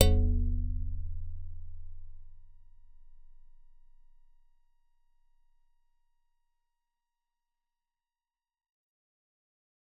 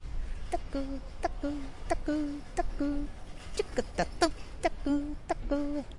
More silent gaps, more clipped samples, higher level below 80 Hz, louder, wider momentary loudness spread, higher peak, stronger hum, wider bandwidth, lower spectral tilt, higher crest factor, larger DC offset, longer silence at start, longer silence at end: neither; neither; about the same, -38 dBFS vs -40 dBFS; about the same, -34 LUFS vs -35 LUFS; first, 24 LU vs 9 LU; first, -4 dBFS vs -10 dBFS; neither; second, 4.8 kHz vs 11.5 kHz; first, -6.5 dB/octave vs -5 dB/octave; first, 32 dB vs 22 dB; neither; about the same, 0 s vs 0 s; first, 6.7 s vs 0 s